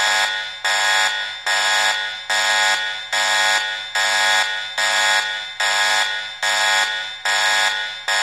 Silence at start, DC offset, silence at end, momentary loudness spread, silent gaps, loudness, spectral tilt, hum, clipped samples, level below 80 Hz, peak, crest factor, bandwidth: 0 s; 0.1%; 0 s; 6 LU; none; -17 LUFS; 3 dB/octave; none; under 0.1%; -72 dBFS; -6 dBFS; 14 dB; 15 kHz